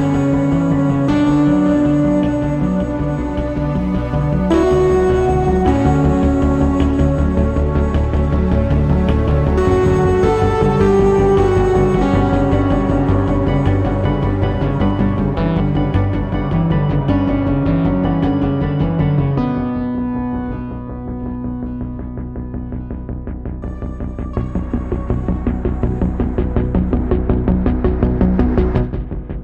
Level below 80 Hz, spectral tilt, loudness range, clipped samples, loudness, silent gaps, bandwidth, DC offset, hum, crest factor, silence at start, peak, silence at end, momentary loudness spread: -22 dBFS; -9 dB/octave; 10 LU; under 0.1%; -16 LUFS; none; 8.6 kHz; under 0.1%; none; 14 dB; 0 s; 0 dBFS; 0 s; 12 LU